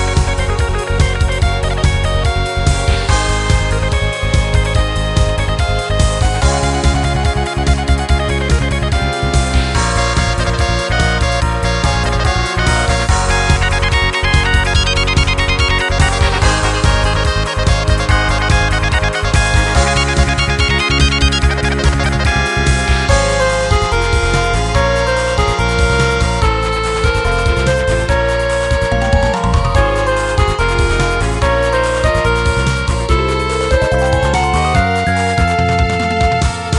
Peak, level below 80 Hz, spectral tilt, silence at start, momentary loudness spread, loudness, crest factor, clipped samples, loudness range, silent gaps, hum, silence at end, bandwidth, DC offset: 0 dBFS; -18 dBFS; -4.5 dB/octave; 0 s; 3 LU; -14 LUFS; 12 dB; under 0.1%; 2 LU; none; none; 0 s; 12 kHz; under 0.1%